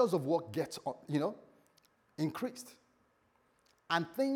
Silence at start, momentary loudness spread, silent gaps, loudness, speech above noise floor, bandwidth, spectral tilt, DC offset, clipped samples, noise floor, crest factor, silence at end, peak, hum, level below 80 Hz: 0 s; 19 LU; none; -36 LUFS; 38 dB; 19.5 kHz; -5.5 dB/octave; under 0.1%; under 0.1%; -73 dBFS; 20 dB; 0 s; -16 dBFS; none; -84 dBFS